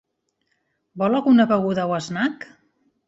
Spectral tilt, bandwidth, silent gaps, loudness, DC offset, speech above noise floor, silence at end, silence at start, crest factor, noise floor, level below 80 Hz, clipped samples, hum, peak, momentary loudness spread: -6.5 dB/octave; 8 kHz; none; -20 LUFS; under 0.1%; 53 dB; 0.65 s; 0.95 s; 16 dB; -72 dBFS; -64 dBFS; under 0.1%; none; -6 dBFS; 13 LU